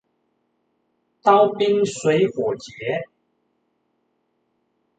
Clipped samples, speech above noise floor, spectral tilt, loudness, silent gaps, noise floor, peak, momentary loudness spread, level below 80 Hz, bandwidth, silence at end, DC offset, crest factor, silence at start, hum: under 0.1%; 51 dB; -5 dB/octave; -20 LUFS; none; -70 dBFS; -2 dBFS; 11 LU; -66 dBFS; 9.2 kHz; 1.95 s; under 0.1%; 20 dB; 1.25 s; none